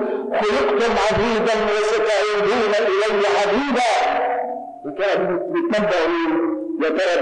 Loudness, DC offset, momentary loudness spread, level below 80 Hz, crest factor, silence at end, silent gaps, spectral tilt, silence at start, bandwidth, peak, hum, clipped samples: -19 LUFS; under 0.1%; 5 LU; -48 dBFS; 8 dB; 0 s; none; -4 dB/octave; 0 s; 10 kHz; -12 dBFS; none; under 0.1%